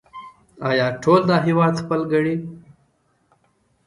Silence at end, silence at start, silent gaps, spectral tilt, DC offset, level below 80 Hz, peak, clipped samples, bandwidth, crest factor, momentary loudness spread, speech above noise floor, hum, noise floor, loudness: 1.3 s; 0.15 s; none; -7 dB/octave; under 0.1%; -58 dBFS; -2 dBFS; under 0.1%; 11 kHz; 18 dB; 19 LU; 45 dB; none; -64 dBFS; -19 LUFS